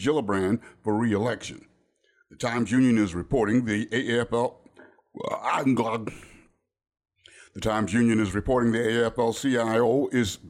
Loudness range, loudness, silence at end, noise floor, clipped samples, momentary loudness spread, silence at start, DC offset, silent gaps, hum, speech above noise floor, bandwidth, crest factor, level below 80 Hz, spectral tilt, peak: 5 LU; -25 LUFS; 0 s; -67 dBFS; under 0.1%; 10 LU; 0 s; under 0.1%; none; none; 42 dB; 14.5 kHz; 14 dB; -50 dBFS; -6 dB/octave; -12 dBFS